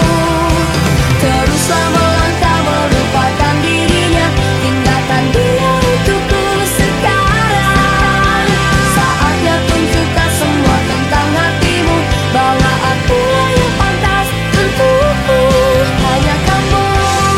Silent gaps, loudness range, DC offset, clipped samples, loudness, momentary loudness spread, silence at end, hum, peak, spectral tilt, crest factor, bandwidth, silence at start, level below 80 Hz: none; 1 LU; under 0.1%; under 0.1%; -11 LUFS; 2 LU; 0 s; none; 0 dBFS; -5 dB/octave; 10 dB; 16.5 kHz; 0 s; -22 dBFS